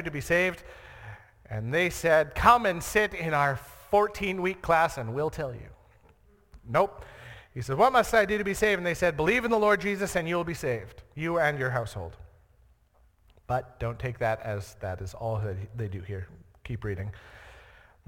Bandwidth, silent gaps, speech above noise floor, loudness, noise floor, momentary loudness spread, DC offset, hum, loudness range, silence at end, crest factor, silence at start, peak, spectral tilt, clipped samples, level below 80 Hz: 17.5 kHz; none; 36 dB; -27 LUFS; -63 dBFS; 19 LU; under 0.1%; none; 9 LU; 0.5 s; 24 dB; 0 s; -4 dBFS; -5 dB/octave; under 0.1%; -50 dBFS